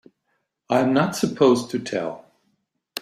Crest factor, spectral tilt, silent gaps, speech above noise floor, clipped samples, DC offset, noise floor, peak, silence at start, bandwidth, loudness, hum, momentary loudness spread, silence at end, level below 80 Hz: 18 dB; -5.5 dB/octave; none; 53 dB; under 0.1%; under 0.1%; -74 dBFS; -4 dBFS; 0.7 s; 15.5 kHz; -21 LUFS; none; 15 LU; 0 s; -64 dBFS